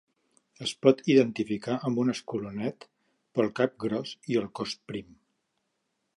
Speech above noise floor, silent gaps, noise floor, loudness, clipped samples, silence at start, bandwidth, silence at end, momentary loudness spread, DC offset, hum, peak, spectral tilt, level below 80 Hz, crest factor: 51 dB; none; -79 dBFS; -28 LUFS; under 0.1%; 0.6 s; 11.5 kHz; 1.15 s; 12 LU; under 0.1%; none; -6 dBFS; -6 dB/octave; -70 dBFS; 24 dB